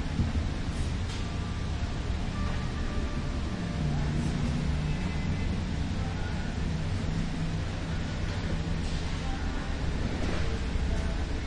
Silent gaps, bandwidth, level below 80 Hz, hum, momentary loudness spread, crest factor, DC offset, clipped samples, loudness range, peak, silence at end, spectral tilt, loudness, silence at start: none; 11 kHz; -34 dBFS; none; 3 LU; 14 dB; under 0.1%; under 0.1%; 2 LU; -16 dBFS; 0 s; -6 dB/octave; -32 LUFS; 0 s